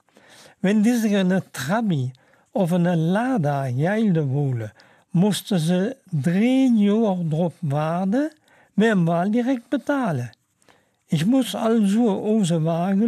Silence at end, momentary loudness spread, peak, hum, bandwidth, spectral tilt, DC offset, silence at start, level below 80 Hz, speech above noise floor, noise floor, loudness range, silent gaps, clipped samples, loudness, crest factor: 0 s; 8 LU; -8 dBFS; none; 15 kHz; -7 dB/octave; under 0.1%; 0.65 s; -68 dBFS; 39 dB; -59 dBFS; 2 LU; none; under 0.1%; -21 LUFS; 12 dB